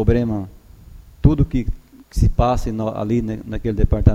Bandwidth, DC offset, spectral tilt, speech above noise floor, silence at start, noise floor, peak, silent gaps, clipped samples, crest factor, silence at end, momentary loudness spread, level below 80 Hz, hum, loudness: 13.5 kHz; under 0.1%; -8.5 dB/octave; 24 dB; 0 s; -42 dBFS; 0 dBFS; none; under 0.1%; 18 dB; 0 s; 13 LU; -24 dBFS; none; -20 LUFS